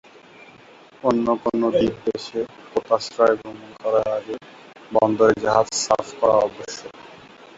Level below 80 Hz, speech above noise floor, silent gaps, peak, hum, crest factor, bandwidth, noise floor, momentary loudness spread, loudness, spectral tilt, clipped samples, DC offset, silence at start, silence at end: -56 dBFS; 27 dB; none; -2 dBFS; none; 20 dB; 8 kHz; -48 dBFS; 16 LU; -21 LUFS; -4.5 dB/octave; under 0.1%; under 0.1%; 1.05 s; 0.4 s